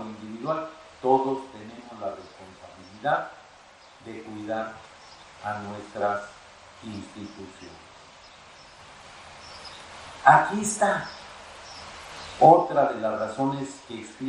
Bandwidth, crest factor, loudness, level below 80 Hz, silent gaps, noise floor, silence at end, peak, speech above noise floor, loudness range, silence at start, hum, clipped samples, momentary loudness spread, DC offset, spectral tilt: 16 kHz; 26 dB; -24 LUFS; -62 dBFS; none; -51 dBFS; 0 s; -2 dBFS; 27 dB; 17 LU; 0 s; none; under 0.1%; 27 LU; under 0.1%; -4.5 dB/octave